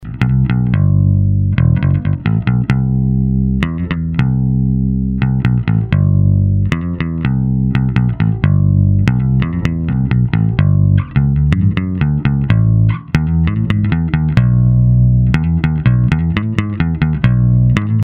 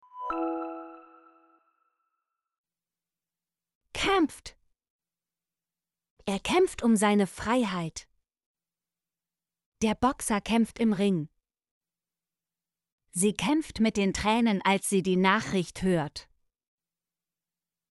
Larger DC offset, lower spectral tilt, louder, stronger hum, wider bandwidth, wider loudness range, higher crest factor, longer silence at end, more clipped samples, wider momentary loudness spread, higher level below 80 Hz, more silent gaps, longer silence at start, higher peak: neither; first, -9.5 dB/octave vs -4.5 dB/octave; first, -14 LUFS vs -27 LUFS; neither; second, 6 kHz vs 11.5 kHz; second, 2 LU vs 7 LU; second, 12 dB vs 20 dB; second, 0 s vs 1.7 s; neither; second, 5 LU vs 15 LU; first, -24 dBFS vs -54 dBFS; second, none vs 2.58-2.64 s, 3.75-3.81 s, 4.90-4.99 s, 6.10-6.17 s, 8.46-8.55 s, 9.66-9.72 s, 11.71-11.81 s, 12.92-12.98 s; second, 0 s vs 0.15 s; first, 0 dBFS vs -10 dBFS